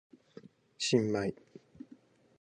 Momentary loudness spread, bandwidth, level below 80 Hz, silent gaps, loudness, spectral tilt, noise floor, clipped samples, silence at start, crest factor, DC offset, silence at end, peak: 25 LU; 10 kHz; -70 dBFS; none; -32 LUFS; -4.5 dB/octave; -60 dBFS; under 0.1%; 0.8 s; 22 dB; under 0.1%; 1.05 s; -14 dBFS